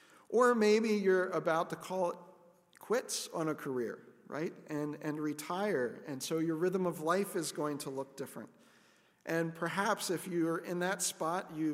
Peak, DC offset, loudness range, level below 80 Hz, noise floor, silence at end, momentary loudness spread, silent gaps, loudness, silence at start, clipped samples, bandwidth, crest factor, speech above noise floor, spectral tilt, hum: -16 dBFS; under 0.1%; 6 LU; -86 dBFS; -67 dBFS; 0 s; 12 LU; none; -34 LUFS; 0.3 s; under 0.1%; 16 kHz; 18 dB; 33 dB; -4.5 dB/octave; none